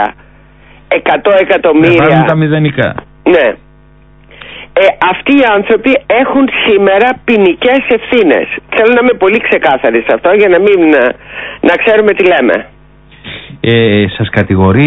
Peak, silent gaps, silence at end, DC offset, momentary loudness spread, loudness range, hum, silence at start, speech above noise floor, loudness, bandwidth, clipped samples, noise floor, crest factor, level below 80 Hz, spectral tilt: 0 dBFS; none; 0 s; under 0.1%; 9 LU; 2 LU; none; 0 s; 32 dB; -8 LUFS; 8 kHz; 0.3%; -40 dBFS; 8 dB; -36 dBFS; -8.5 dB/octave